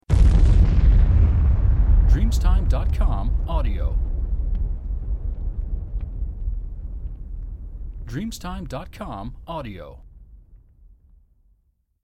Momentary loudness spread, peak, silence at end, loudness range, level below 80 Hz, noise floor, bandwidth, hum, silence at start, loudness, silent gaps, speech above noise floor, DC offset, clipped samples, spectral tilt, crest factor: 18 LU; -6 dBFS; 1.45 s; 15 LU; -20 dBFS; -66 dBFS; 8.4 kHz; none; 0.1 s; -23 LUFS; none; 44 dB; under 0.1%; under 0.1%; -7.5 dB/octave; 14 dB